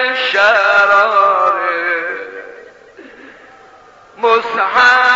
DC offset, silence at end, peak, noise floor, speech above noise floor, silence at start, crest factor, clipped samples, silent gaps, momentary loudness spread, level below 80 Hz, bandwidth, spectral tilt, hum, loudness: under 0.1%; 0 s; 0 dBFS; -42 dBFS; 32 dB; 0 s; 14 dB; under 0.1%; none; 13 LU; -58 dBFS; 7.8 kHz; 2.5 dB/octave; none; -12 LUFS